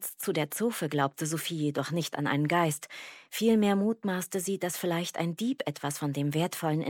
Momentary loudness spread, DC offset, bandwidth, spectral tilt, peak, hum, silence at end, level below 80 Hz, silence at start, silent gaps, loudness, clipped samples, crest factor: 7 LU; under 0.1%; 18 kHz; -5 dB/octave; -12 dBFS; none; 0 s; -78 dBFS; 0 s; none; -30 LUFS; under 0.1%; 18 dB